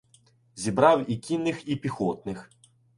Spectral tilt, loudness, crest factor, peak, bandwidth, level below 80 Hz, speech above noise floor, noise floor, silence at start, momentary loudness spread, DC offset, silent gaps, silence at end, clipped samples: -6 dB/octave; -26 LUFS; 22 dB; -4 dBFS; 11.5 kHz; -60 dBFS; 36 dB; -61 dBFS; 0.55 s; 15 LU; under 0.1%; none; 0.55 s; under 0.1%